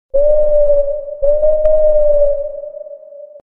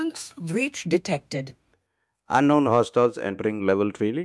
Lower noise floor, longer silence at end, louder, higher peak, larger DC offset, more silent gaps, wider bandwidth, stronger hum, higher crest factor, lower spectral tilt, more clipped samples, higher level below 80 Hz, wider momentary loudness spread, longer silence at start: second, -34 dBFS vs -76 dBFS; first, 0.15 s vs 0 s; first, -13 LUFS vs -24 LUFS; first, 0 dBFS vs -6 dBFS; neither; neither; second, 1.5 kHz vs 12 kHz; neither; second, 12 dB vs 18 dB; first, -10 dB/octave vs -6 dB/octave; neither; first, -26 dBFS vs -66 dBFS; first, 18 LU vs 13 LU; first, 0.15 s vs 0 s